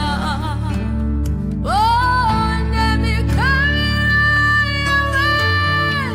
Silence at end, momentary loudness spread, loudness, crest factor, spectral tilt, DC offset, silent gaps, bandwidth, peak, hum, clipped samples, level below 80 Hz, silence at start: 0 s; 8 LU; -16 LUFS; 10 dB; -5.5 dB/octave; under 0.1%; none; 16 kHz; -6 dBFS; none; under 0.1%; -24 dBFS; 0 s